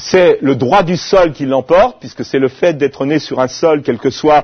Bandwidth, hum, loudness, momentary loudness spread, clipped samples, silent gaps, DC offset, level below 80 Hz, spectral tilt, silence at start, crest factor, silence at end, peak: 6.6 kHz; none; -13 LUFS; 6 LU; 0.1%; none; under 0.1%; -40 dBFS; -5.5 dB/octave; 0 s; 12 dB; 0 s; 0 dBFS